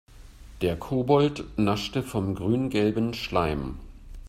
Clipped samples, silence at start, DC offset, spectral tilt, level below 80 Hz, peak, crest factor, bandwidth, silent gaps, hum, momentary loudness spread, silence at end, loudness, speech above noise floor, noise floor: under 0.1%; 0.1 s; under 0.1%; -6.5 dB/octave; -44 dBFS; -8 dBFS; 20 dB; 16 kHz; none; none; 8 LU; 0 s; -26 LUFS; 21 dB; -46 dBFS